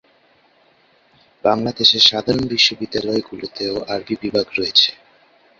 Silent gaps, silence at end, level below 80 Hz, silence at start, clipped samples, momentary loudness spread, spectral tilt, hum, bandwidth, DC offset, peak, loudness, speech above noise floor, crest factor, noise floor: none; 0.65 s; -52 dBFS; 1.45 s; under 0.1%; 12 LU; -3.5 dB/octave; none; 7.8 kHz; under 0.1%; 0 dBFS; -16 LUFS; 38 dB; 20 dB; -56 dBFS